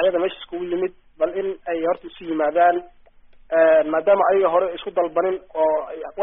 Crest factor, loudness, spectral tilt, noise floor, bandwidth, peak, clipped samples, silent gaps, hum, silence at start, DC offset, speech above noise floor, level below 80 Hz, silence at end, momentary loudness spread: 16 dB; -21 LUFS; -2.5 dB/octave; -48 dBFS; 3.9 kHz; -4 dBFS; under 0.1%; none; none; 0 s; under 0.1%; 28 dB; -56 dBFS; 0 s; 11 LU